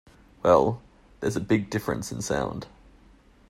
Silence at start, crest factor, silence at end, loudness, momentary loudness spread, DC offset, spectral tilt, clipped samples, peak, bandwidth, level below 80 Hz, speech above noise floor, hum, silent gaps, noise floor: 0.45 s; 22 dB; 0.8 s; -26 LUFS; 16 LU; under 0.1%; -6 dB/octave; under 0.1%; -6 dBFS; 15.5 kHz; -52 dBFS; 31 dB; none; none; -55 dBFS